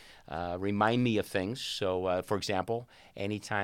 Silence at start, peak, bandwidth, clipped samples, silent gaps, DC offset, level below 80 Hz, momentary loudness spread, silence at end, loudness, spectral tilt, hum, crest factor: 0 s; -12 dBFS; 16.5 kHz; under 0.1%; none; under 0.1%; -62 dBFS; 11 LU; 0 s; -32 LUFS; -5.5 dB/octave; none; 20 dB